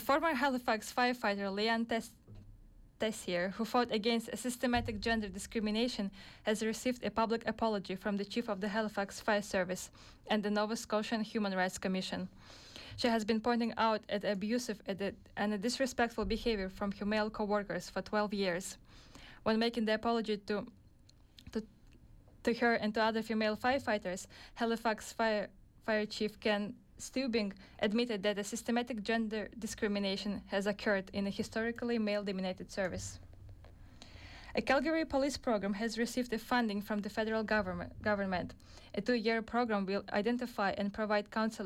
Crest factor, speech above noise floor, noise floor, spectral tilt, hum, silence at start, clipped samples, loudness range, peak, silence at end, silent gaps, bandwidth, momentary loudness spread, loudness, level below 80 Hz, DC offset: 16 dB; 27 dB; -62 dBFS; -4.5 dB/octave; none; 0 s; under 0.1%; 2 LU; -20 dBFS; 0 s; none; 16 kHz; 9 LU; -35 LUFS; -58 dBFS; under 0.1%